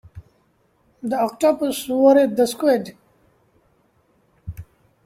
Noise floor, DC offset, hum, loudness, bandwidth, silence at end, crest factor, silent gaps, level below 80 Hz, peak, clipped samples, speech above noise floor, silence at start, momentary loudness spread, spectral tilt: -62 dBFS; under 0.1%; none; -19 LUFS; 16 kHz; 0.45 s; 18 dB; none; -54 dBFS; -4 dBFS; under 0.1%; 44 dB; 0.15 s; 23 LU; -5 dB/octave